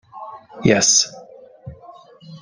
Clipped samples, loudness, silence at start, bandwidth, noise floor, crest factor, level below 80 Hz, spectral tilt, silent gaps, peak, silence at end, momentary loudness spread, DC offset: under 0.1%; -15 LUFS; 0.15 s; 10.5 kHz; -44 dBFS; 20 dB; -54 dBFS; -2.5 dB/octave; none; -2 dBFS; 0.05 s; 24 LU; under 0.1%